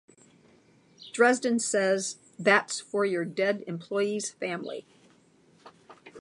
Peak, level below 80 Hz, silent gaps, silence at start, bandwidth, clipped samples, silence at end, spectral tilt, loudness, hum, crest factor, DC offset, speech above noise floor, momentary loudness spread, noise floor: -6 dBFS; -82 dBFS; none; 1 s; 11.5 kHz; under 0.1%; 0 s; -3.5 dB/octave; -27 LUFS; none; 24 dB; under 0.1%; 34 dB; 12 LU; -61 dBFS